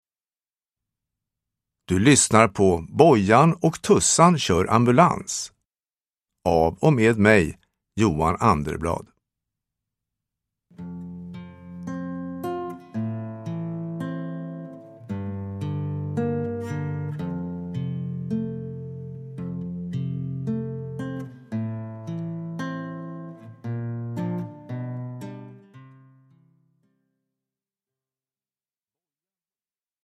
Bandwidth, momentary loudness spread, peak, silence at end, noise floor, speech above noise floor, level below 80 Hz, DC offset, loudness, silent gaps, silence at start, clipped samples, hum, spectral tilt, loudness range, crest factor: 13.5 kHz; 20 LU; 0 dBFS; 4.15 s; under -90 dBFS; over 71 dB; -50 dBFS; under 0.1%; -23 LUFS; none; 1.9 s; under 0.1%; none; -5 dB/octave; 17 LU; 24 dB